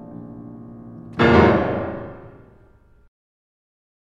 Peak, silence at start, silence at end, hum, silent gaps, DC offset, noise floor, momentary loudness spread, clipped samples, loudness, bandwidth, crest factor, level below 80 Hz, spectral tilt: 0 dBFS; 0 s; 1.85 s; none; none; under 0.1%; -52 dBFS; 25 LU; under 0.1%; -17 LUFS; 7.4 kHz; 22 dB; -42 dBFS; -8 dB/octave